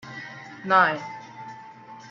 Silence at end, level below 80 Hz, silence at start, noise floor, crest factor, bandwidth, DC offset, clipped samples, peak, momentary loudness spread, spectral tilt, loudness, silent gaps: 0 s; -74 dBFS; 0.05 s; -44 dBFS; 22 dB; 7.4 kHz; under 0.1%; under 0.1%; -4 dBFS; 24 LU; -5 dB/octave; -21 LUFS; none